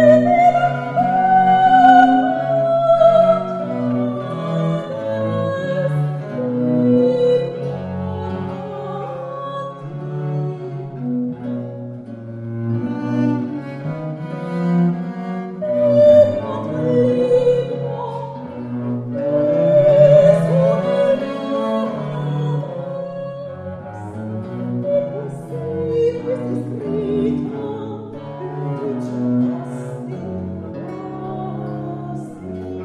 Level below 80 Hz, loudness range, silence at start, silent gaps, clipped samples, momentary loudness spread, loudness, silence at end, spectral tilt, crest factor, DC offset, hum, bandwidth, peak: -54 dBFS; 12 LU; 0 s; none; under 0.1%; 17 LU; -18 LUFS; 0 s; -8.5 dB/octave; 18 dB; under 0.1%; none; 9.6 kHz; 0 dBFS